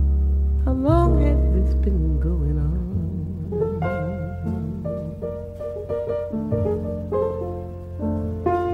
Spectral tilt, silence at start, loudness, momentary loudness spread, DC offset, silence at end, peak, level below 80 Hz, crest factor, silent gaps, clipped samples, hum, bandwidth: -10.5 dB/octave; 0 s; -24 LUFS; 11 LU; under 0.1%; 0 s; -4 dBFS; -24 dBFS; 18 dB; none; under 0.1%; none; 4 kHz